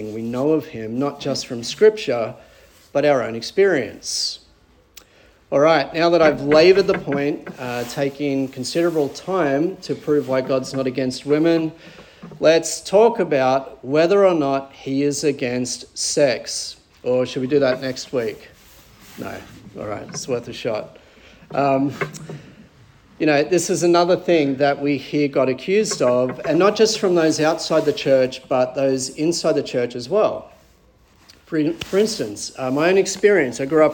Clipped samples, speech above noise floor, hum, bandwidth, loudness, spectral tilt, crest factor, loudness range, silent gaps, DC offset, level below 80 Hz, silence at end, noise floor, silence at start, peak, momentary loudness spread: under 0.1%; 35 dB; none; 18 kHz; -19 LUFS; -4.5 dB/octave; 18 dB; 7 LU; none; under 0.1%; -56 dBFS; 0 s; -54 dBFS; 0 s; -2 dBFS; 12 LU